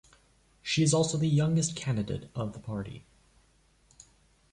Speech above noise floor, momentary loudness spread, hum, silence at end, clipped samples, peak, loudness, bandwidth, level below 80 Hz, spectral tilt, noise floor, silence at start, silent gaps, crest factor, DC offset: 37 dB; 14 LU; none; 1.5 s; under 0.1%; -14 dBFS; -29 LUFS; 11 kHz; -58 dBFS; -5 dB/octave; -65 dBFS; 0.65 s; none; 18 dB; under 0.1%